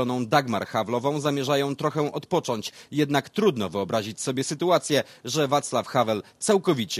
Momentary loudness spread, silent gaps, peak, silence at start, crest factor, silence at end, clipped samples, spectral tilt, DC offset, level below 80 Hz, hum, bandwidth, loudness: 6 LU; none; -6 dBFS; 0 s; 20 dB; 0 s; under 0.1%; -4.5 dB/octave; under 0.1%; -64 dBFS; none; 15.5 kHz; -25 LUFS